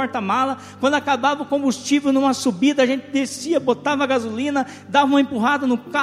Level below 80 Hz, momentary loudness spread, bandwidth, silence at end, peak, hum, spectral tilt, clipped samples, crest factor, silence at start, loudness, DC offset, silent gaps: -64 dBFS; 5 LU; 14 kHz; 0 s; -4 dBFS; none; -4 dB/octave; under 0.1%; 16 dB; 0 s; -20 LUFS; under 0.1%; none